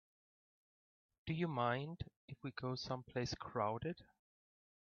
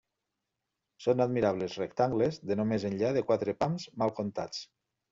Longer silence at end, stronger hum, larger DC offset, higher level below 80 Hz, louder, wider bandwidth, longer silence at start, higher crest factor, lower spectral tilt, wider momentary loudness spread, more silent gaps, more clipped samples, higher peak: first, 0.85 s vs 0.45 s; neither; neither; about the same, -68 dBFS vs -66 dBFS; second, -43 LUFS vs -31 LUFS; second, 7 kHz vs 7.8 kHz; first, 1.25 s vs 1 s; about the same, 22 dB vs 18 dB; about the same, -5 dB/octave vs -6 dB/octave; first, 13 LU vs 7 LU; first, 2.16-2.28 s vs none; neither; second, -24 dBFS vs -14 dBFS